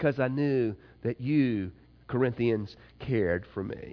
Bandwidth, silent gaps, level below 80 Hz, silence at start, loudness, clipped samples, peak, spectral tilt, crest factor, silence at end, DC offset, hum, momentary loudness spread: 5.4 kHz; none; -56 dBFS; 0 s; -30 LUFS; under 0.1%; -12 dBFS; -10 dB/octave; 16 dB; 0 s; under 0.1%; none; 10 LU